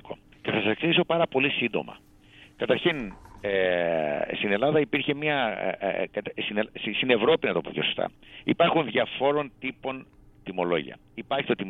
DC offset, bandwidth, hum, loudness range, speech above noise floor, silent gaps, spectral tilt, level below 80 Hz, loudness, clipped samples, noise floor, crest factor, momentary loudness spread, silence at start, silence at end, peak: under 0.1%; 4.5 kHz; none; 2 LU; 27 dB; none; -7.5 dB/octave; -58 dBFS; -26 LUFS; under 0.1%; -53 dBFS; 20 dB; 13 LU; 0.05 s; 0 s; -6 dBFS